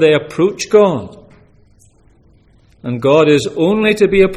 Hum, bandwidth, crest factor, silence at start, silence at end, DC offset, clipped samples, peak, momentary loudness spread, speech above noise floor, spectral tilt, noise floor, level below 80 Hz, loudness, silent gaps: none; 12.5 kHz; 14 dB; 0 s; 0 s; under 0.1%; under 0.1%; 0 dBFS; 14 LU; 37 dB; -5.5 dB/octave; -49 dBFS; -42 dBFS; -13 LUFS; none